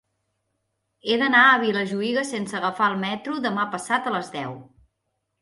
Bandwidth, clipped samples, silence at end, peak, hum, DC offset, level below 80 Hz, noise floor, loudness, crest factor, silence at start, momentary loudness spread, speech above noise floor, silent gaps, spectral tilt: 11.5 kHz; under 0.1%; 0.8 s; -4 dBFS; none; under 0.1%; -70 dBFS; -77 dBFS; -22 LUFS; 20 dB; 1.05 s; 17 LU; 55 dB; none; -4 dB/octave